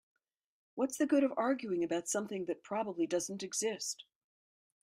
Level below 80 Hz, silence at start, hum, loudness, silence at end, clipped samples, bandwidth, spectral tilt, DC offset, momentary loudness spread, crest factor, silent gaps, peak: -82 dBFS; 0.75 s; none; -35 LUFS; 0.8 s; under 0.1%; 15.5 kHz; -3.5 dB/octave; under 0.1%; 9 LU; 18 dB; none; -18 dBFS